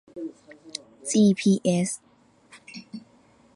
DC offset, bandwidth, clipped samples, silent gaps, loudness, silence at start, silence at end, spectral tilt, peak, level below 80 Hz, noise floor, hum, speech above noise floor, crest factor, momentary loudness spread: under 0.1%; 11.5 kHz; under 0.1%; none; -23 LUFS; 0.15 s; 0.55 s; -5.5 dB/octave; -10 dBFS; -68 dBFS; -58 dBFS; none; 34 dB; 18 dB; 23 LU